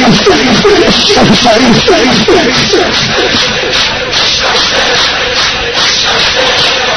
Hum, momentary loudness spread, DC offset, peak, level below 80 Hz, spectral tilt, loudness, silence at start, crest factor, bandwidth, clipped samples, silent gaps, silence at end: none; 3 LU; under 0.1%; 0 dBFS; -30 dBFS; -3 dB/octave; -6 LUFS; 0 s; 8 dB; 11 kHz; 2%; none; 0 s